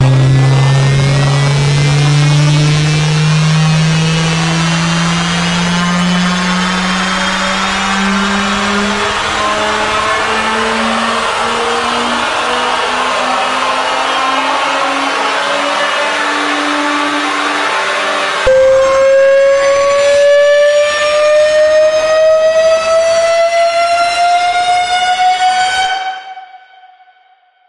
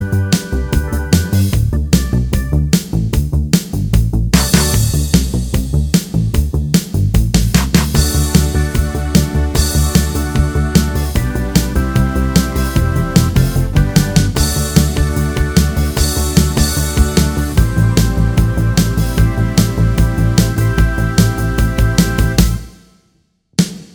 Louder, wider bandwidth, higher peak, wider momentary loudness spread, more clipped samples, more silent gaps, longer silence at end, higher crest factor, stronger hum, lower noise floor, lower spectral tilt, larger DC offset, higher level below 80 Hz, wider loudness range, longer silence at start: first, -11 LUFS vs -14 LUFS; second, 11.5 kHz vs over 20 kHz; about the same, 0 dBFS vs 0 dBFS; about the same, 4 LU vs 4 LU; neither; neither; first, 1.1 s vs 0.1 s; about the same, 10 dB vs 14 dB; neither; second, -49 dBFS vs -58 dBFS; about the same, -4.5 dB/octave vs -5 dB/octave; neither; second, -38 dBFS vs -18 dBFS; first, 4 LU vs 1 LU; about the same, 0 s vs 0 s